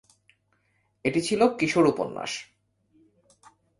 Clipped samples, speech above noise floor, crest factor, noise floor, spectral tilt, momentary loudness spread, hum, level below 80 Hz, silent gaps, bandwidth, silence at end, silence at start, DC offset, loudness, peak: under 0.1%; 46 dB; 22 dB; -70 dBFS; -5 dB/octave; 11 LU; none; -64 dBFS; none; 11.5 kHz; 1.35 s; 1.05 s; under 0.1%; -25 LUFS; -6 dBFS